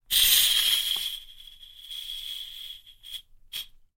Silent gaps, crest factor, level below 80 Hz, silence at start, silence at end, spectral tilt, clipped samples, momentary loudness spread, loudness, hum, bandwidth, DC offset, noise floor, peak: none; 22 dB; -54 dBFS; 0.1 s; 0.35 s; 3.5 dB/octave; under 0.1%; 23 LU; -22 LUFS; none; 17 kHz; under 0.1%; -48 dBFS; -6 dBFS